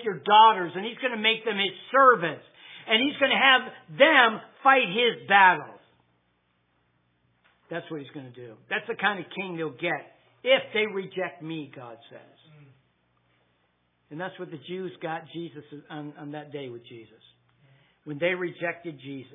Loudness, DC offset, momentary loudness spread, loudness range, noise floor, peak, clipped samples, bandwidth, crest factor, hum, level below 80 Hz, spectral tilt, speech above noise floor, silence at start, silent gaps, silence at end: -23 LUFS; under 0.1%; 22 LU; 19 LU; -71 dBFS; -2 dBFS; under 0.1%; 3.9 kHz; 24 dB; none; -84 dBFS; -7 dB/octave; 45 dB; 0 s; none; 0.1 s